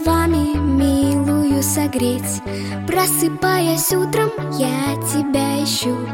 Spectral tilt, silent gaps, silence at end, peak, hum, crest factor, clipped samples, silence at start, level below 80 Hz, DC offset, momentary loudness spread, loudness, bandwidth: -4.5 dB/octave; none; 0 s; -4 dBFS; none; 14 dB; under 0.1%; 0 s; -34 dBFS; under 0.1%; 5 LU; -18 LUFS; 17 kHz